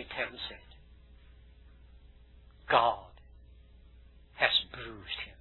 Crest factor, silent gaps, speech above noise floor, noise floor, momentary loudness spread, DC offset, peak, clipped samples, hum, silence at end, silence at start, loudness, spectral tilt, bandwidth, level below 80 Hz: 28 dB; none; 25 dB; -56 dBFS; 16 LU; under 0.1%; -8 dBFS; under 0.1%; none; 0.1 s; 0 s; -31 LUFS; -5 dB/octave; 4.3 kHz; -56 dBFS